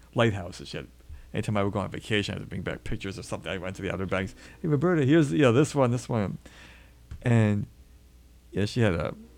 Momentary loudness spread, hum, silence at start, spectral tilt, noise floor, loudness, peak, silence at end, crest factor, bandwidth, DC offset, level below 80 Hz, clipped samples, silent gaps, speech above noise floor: 16 LU; none; 0.15 s; -6.5 dB/octave; -54 dBFS; -27 LUFS; -8 dBFS; 0.1 s; 20 dB; 13 kHz; under 0.1%; -48 dBFS; under 0.1%; none; 27 dB